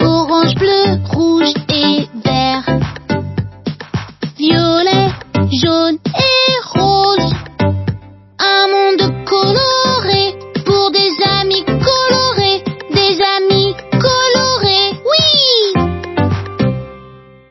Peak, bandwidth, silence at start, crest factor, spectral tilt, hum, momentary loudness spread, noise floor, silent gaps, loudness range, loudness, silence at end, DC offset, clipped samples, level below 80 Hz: 0 dBFS; 6.2 kHz; 0 s; 14 dB; -5 dB/octave; none; 9 LU; -38 dBFS; none; 4 LU; -12 LUFS; 0.3 s; under 0.1%; under 0.1%; -34 dBFS